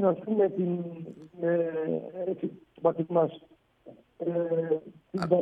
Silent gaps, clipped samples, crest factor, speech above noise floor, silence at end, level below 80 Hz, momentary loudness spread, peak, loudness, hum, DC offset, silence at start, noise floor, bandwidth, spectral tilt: none; under 0.1%; 20 dB; 25 dB; 0 s; -72 dBFS; 11 LU; -10 dBFS; -30 LUFS; none; under 0.1%; 0 s; -54 dBFS; 7.6 kHz; -9.5 dB/octave